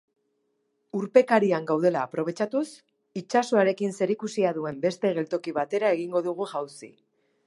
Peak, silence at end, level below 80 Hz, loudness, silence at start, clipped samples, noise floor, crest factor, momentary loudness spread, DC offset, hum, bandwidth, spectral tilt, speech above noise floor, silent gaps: -4 dBFS; 0.6 s; -78 dBFS; -26 LUFS; 0.95 s; under 0.1%; -74 dBFS; 22 dB; 13 LU; under 0.1%; none; 11.5 kHz; -6 dB/octave; 49 dB; none